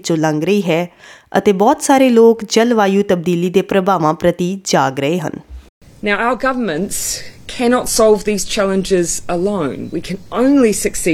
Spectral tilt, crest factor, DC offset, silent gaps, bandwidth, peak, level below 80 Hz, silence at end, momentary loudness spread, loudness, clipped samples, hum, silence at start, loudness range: -4.5 dB/octave; 14 dB; under 0.1%; 5.69-5.81 s; 17.5 kHz; 0 dBFS; -40 dBFS; 0 s; 10 LU; -15 LUFS; under 0.1%; none; 0.05 s; 5 LU